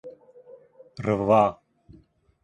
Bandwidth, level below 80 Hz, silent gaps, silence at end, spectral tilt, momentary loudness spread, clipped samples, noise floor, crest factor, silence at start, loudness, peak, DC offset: 10 kHz; -58 dBFS; none; 0.9 s; -8 dB/octave; 26 LU; under 0.1%; -57 dBFS; 22 dB; 0.05 s; -23 LUFS; -6 dBFS; under 0.1%